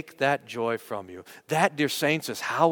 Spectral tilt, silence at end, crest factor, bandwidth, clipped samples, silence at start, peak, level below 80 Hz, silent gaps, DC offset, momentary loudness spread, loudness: -4 dB/octave; 0 s; 22 dB; 19 kHz; under 0.1%; 0.05 s; -4 dBFS; -74 dBFS; none; under 0.1%; 12 LU; -27 LUFS